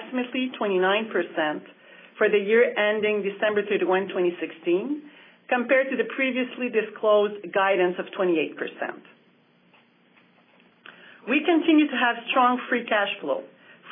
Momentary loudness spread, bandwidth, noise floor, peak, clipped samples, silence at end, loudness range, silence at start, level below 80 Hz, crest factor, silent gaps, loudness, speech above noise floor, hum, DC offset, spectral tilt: 10 LU; 3.8 kHz; -60 dBFS; -8 dBFS; under 0.1%; 0 s; 5 LU; 0 s; under -90 dBFS; 18 dB; none; -24 LUFS; 37 dB; none; under 0.1%; -8.5 dB/octave